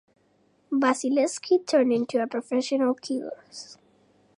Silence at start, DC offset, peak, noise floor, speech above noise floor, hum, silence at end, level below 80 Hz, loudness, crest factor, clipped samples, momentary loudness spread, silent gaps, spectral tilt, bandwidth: 0.7 s; under 0.1%; -10 dBFS; -65 dBFS; 40 dB; 50 Hz at -70 dBFS; 0.65 s; -82 dBFS; -25 LUFS; 16 dB; under 0.1%; 17 LU; none; -3.5 dB/octave; 11.5 kHz